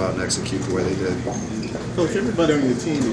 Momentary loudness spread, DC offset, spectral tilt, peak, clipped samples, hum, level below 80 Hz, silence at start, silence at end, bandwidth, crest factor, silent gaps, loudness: 8 LU; under 0.1%; -5 dB/octave; -6 dBFS; under 0.1%; none; -44 dBFS; 0 s; 0 s; 11 kHz; 16 dB; none; -22 LUFS